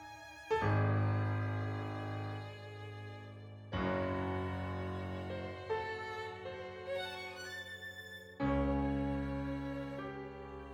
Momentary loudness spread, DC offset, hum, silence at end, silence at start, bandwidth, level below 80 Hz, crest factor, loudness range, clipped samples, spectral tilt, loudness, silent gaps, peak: 14 LU; under 0.1%; none; 0 s; 0 s; 14 kHz; -52 dBFS; 18 dB; 4 LU; under 0.1%; -7.5 dB/octave; -39 LUFS; none; -22 dBFS